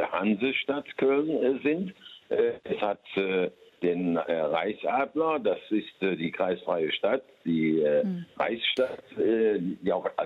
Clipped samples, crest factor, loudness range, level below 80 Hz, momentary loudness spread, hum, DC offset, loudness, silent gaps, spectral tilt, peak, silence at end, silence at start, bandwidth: under 0.1%; 14 dB; 2 LU; -70 dBFS; 6 LU; none; under 0.1%; -28 LUFS; none; -7.5 dB/octave; -12 dBFS; 0 s; 0 s; 6.8 kHz